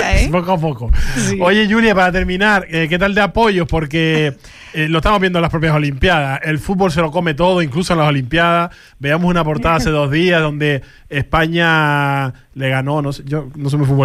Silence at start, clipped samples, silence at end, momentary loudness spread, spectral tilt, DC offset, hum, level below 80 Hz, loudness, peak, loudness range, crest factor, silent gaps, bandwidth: 0 s; under 0.1%; 0 s; 8 LU; -6 dB/octave; under 0.1%; none; -26 dBFS; -15 LUFS; -2 dBFS; 2 LU; 12 dB; none; 14.5 kHz